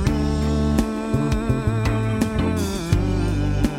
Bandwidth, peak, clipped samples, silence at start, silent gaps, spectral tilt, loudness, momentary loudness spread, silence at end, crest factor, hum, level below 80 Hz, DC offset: 16 kHz; -4 dBFS; under 0.1%; 0 s; none; -7 dB/octave; -22 LUFS; 2 LU; 0 s; 18 dB; none; -28 dBFS; under 0.1%